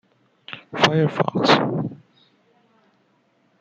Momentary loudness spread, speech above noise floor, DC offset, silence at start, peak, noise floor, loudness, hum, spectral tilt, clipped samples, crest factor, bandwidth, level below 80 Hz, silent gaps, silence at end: 18 LU; 44 dB; under 0.1%; 0.5 s; -2 dBFS; -63 dBFS; -20 LUFS; none; -5.5 dB/octave; under 0.1%; 22 dB; 9 kHz; -64 dBFS; none; 1.65 s